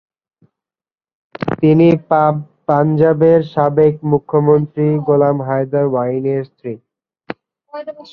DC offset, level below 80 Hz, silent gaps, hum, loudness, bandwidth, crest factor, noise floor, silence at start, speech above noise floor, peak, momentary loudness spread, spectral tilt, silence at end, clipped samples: under 0.1%; -54 dBFS; none; none; -14 LUFS; 5.4 kHz; 14 dB; under -90 dBFS; 1.4 s; over 76 dB; -2 dBFS; 18 LU; -11 dB/octave; 0.1 s; under 0.1%